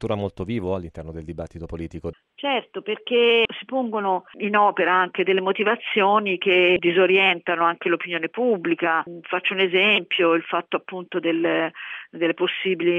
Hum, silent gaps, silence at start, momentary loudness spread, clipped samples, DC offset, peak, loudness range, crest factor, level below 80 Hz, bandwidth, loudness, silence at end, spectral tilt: none; none; 0 s; 16 LU; under 0.1%; under 0.1%; -6 dBFS; 5 LU; 16 dB; -52 dBFS; 4.7 kHz; -21 LUFS; 0 s; -6.5 dB/octave